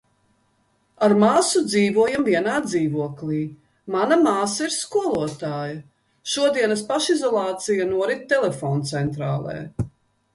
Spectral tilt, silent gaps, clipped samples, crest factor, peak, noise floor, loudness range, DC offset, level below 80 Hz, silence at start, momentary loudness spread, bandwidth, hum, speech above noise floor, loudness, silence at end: -4.5 dB/octave; none; under 0.1%; 18 dB; -4 dBFS; -65 dBFS; 3 LU; under 0.1%; -54 dBFS; 1 s; 12 LU; 11.5 kHz; none; 44 dB; -21 LUFS; 0.45 s